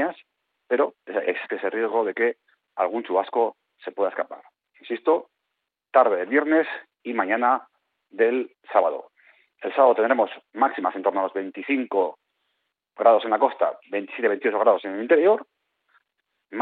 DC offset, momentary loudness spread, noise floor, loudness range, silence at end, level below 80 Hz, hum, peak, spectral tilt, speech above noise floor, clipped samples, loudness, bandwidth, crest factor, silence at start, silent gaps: under 0.1%; 12 LU; -81 dBFS; 4 LU; 0 s; -82 dBFS; none; -4 dBFS; -2 dB/octave; 59 dB; under 0.1%; -23 LUFS; 4.4 kHz; 20 dB; 0 s; none